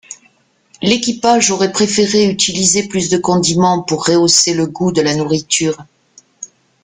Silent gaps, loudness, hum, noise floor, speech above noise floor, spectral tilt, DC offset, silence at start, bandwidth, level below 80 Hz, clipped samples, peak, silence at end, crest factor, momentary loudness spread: none; -13 LUFS; none; -54 dBFS; 41 dB; -3.5 dB/octave; under 0.1%; 0.1 s; 10 kHz; -52 dBFS; under 0.1%; 0 dBFS; 0.4 s; 14 dB; 18 LU